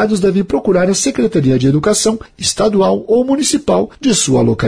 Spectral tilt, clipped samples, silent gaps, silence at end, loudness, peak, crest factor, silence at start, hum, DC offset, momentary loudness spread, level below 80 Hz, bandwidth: -4.5 dB/octave; under 0.1%; none; 0 s; -13 LUFS; -2 dBFS; 10 dB; 0 s; none; 0.4%; 3 LU; -40 dBFS; 11 kHz